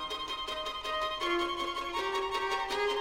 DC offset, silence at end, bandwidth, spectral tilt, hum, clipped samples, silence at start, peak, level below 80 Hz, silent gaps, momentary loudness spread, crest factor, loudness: under 0.1%; 0 s; 16 kHz; -2 dB/octave; none; under 0.1%; 0 s; -18 dBFS; -56 dBFS; none; 4 LU; 16 dB; -33 LUFS